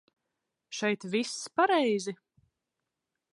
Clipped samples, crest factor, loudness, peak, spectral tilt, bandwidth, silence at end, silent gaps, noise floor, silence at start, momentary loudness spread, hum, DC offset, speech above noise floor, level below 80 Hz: under 0.1%; 20 dB; -29 LUFS; -12 dBFS; -3.5 dB/octave; 11.5 kHz; 1.2 s; none; -86 dBFS; 0.7 s; 15 LU; none; under 0.1%; 57 dB; -82 dBFS